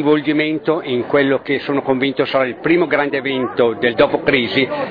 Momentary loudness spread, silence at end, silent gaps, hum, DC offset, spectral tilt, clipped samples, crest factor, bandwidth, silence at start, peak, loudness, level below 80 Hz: 4 LU; 0 s; none; none; under 0.1%; -8 dB/octave; under 0.1%; 16 dB; 5 kHz; 0 s; -2 dBFS; -16 LUFS; -54 dBFS